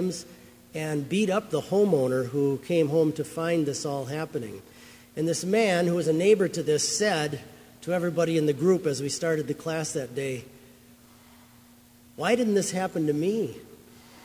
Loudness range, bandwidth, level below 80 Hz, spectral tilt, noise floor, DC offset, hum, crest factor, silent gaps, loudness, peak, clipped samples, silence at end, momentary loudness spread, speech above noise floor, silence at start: 5 LU; 16 kHz; -64 dBFS; -5 dB/octave; -54 dBFS; under 0.1%; none; 18 dB; none; -26 LUFS; -8 dBFS; under 0.1%; 0.05 s; 11 LU; 29 dB; 0 s